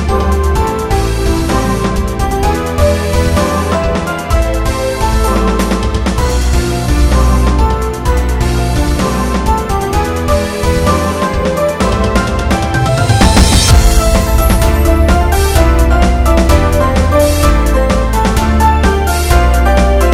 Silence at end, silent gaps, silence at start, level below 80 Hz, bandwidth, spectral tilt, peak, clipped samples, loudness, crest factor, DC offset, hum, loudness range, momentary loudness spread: 0 s; none; 0 s; -14 dBFS; 16 kHz; -5.5 dB/octave; 0 dBFS; 0.5%; -12 LUFS; 10 dB; 0.4%; none; 4 LU; 5 LU